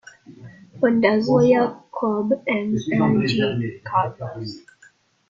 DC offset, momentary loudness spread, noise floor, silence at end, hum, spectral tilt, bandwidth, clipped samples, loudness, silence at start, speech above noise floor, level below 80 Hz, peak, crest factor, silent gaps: under 0.1%; 15 LU; -55 dBFS; 0.7 s; none; -7 dB/octave; 7.6 kHz; under 0.1%; -20 LUFS; 0.3 s; 35 dB; -58 dBFS; -4 dBFS; 18 dB; none